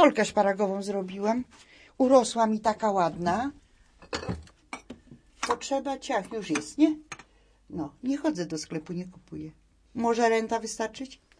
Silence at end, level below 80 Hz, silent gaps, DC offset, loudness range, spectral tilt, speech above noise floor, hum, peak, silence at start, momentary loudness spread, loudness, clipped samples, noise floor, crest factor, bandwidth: 0.25 s; -58 dBFS; none; under 0.1%; 7 LU; -4.5 dB/octave; 29 dB; none; -6 dBFS; 0 s; 18 LU; -28 LUFS; under 0.1%; -56 dBFS; 22 dB; 10.5 kHz